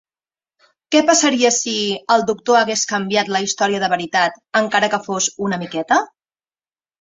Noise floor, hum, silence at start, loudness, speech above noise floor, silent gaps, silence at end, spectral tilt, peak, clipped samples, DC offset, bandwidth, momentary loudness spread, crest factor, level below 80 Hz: under -90 dBFS; none; 0.9 s; -17 LUFS; over 73 dB; none; 0.95 s; -2.5 dB/octave; -2 dBFS; under 0.1%; under 0.1%; 8.2 kHz; 6 LU; 18 dB; -64 dBFS